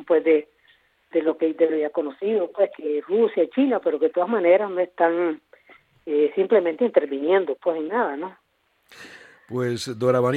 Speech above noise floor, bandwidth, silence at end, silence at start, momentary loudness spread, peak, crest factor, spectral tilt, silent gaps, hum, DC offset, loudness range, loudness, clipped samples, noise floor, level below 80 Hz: 39 dB; 11.5 kHz; 0 s; 0 s; 9 LU; -4 dBFS; 20 dB; -6.5 dB/octave; none; none; under 0.1%; 3 LU; -22 LUFS; under 0.1%; -60 dBFS; -74 dBFS